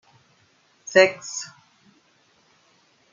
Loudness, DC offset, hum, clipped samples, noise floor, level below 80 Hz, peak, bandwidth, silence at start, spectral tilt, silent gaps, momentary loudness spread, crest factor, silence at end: -21 LUFS; under 0.1%; none; under 0.1%; -62 dBFS; -74 dBFS; -2 dBFS; 7.6 kHz; 0.9 s; -2.5 dB/octave; none; 23 LU; 26 dB; 1.65 s